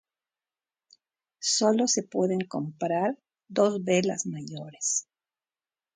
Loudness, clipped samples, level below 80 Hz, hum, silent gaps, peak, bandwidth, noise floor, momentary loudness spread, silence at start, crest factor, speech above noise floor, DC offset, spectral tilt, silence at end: -27 LUFS; under 0.1%; -76 dBFS; none; none; -10 dBFS; 10 kHz; under -90 dBFS; 11 LU; 1.4 s; 18 dB; over 63 dB; under 0.1%; -3.5 dB/octave; 0.95 s